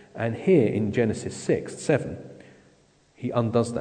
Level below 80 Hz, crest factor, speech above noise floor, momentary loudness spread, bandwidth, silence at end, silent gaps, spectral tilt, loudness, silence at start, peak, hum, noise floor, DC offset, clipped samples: -58 dBFS; 18 dB; 36 dB; 15 LU; 9.4 kHz; 0 s; none; -7 dB/octave; -25 LUFS; 0.15 s; -8 dBFS; none; -60 dBFS; under 0.1%; under 0.1%